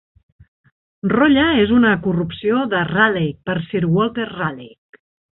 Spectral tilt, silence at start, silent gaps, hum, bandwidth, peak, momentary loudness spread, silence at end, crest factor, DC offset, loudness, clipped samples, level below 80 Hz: -11 dB/octave; 1.05 s; none; none; 4.1 kHz; -2 dBFS; 11 LU; 0.7 s; 18 dB; under 0.1%; -17 LUFS; under 0.1%; -46 dBFS